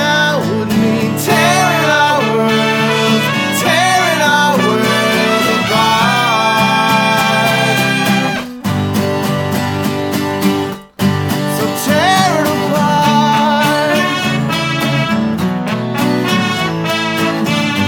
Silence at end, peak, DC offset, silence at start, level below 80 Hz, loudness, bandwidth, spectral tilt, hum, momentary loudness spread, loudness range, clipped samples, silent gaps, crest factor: 0 s; 0 dBFS; under 0.1%; 0 s; -48 dBFS; -13 LUFS; over 20 kHz; -4.5 dB/octave; none; 6 LU; 4 LU; under 0.1%; none; 12 dB